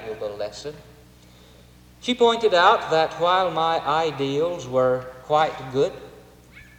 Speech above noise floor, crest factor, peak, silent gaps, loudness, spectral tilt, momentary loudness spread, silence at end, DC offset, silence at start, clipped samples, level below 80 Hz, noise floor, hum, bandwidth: 28 dB; 20 dB; -4 dBFS; none; -22 LUFS; -4.5 dB/octave; 15 LU; 0.15 s; under 0.1%; 0 s; under 0.1%; -56 dBFS; -50 dBFS; none; 16.5 kHz